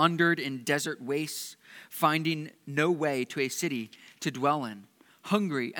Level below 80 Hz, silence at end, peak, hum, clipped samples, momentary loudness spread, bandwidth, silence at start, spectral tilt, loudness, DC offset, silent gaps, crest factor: -86 dBFS; 0 s; -8 dBFS; none; under 0.1%; 15 LU; 19 kHz; 0 s; -4.5 dB/octave; -29 LUFS; under 0.1%; none; 22 dB